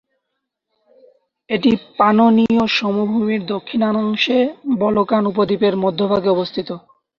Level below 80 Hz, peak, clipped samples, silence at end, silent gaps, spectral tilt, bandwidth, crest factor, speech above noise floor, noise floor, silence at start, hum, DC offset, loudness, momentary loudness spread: -56 dBFS; -2 dBFS; under 0.1%; 0.4 s; none; -7 dB/octave; 6.8 kHz; 16 dB; 60 dB; -77 dBFS; 1.5 s; none; under 0.1%; -17 LUFS; 9 LU